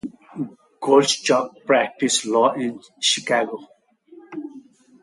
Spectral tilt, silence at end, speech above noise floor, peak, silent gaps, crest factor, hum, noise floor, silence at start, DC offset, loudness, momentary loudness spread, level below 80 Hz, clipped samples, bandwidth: -2.5 dB/octave; 0.45 s; 29 dB; -2 dBFS; none; 20 dB; none; -49 dBFS; 0.05 s; under 0.1%; -20 LUFS; 18 LU; -70 dBFS; under 0.1%; 11.5 kHz